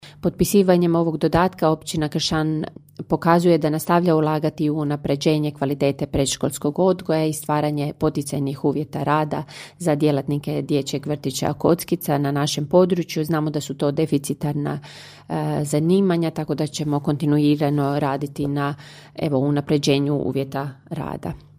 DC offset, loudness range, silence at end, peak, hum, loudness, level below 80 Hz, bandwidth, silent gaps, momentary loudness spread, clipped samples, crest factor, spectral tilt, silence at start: under 0.1%; 3 LU; 0.2 s; -2 dBFS; none; -21 LUFS; -48 dBFS; 15.5 kHz; none; 10 LU; under 0.1%; 20 dB; -6 dB/octave; 0.05 s